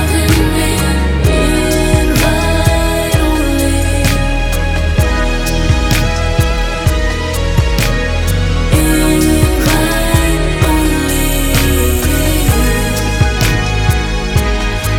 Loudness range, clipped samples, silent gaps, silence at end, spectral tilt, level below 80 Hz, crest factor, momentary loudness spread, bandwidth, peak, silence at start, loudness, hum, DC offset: 2 LU; under 0.1%; none; 0 s; -5 dB/octave; -16 dBFS; 12 dB; 4 LU; 18.5 kHz; 0 dBFS; 0 s; -13 LUFS; none; under 0.1%